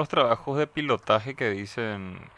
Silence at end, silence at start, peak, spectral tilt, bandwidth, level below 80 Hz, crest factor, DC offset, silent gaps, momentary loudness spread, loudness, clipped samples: 0.1 s; 0 s; -6 dBFS; -6 dB/octave; 11 kHz; -62 dBFS; 20 dB; under 0.1%; none; 9 LU; -27 LUFS; under 0.1%